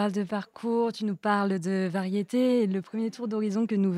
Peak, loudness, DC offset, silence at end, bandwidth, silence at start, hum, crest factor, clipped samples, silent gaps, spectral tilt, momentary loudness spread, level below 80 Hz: -10 dBFS; -28 LUFS; under 0.1%; 0 s; 12 kHz; 0 s; none; 16 dB; under 0.1%; none; -7 dB/octave; 7 LU; -78 dBFS